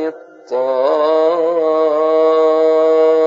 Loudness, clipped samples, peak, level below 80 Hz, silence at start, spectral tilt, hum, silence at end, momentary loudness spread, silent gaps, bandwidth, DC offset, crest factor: -14 LUFS; under 0.1%; -4 dBFS; -82 dBFS; 0 s; -5 dB/octave; none; 0 s; 7 LU; none; 7.4 kHz; under 0.1%; 10 dB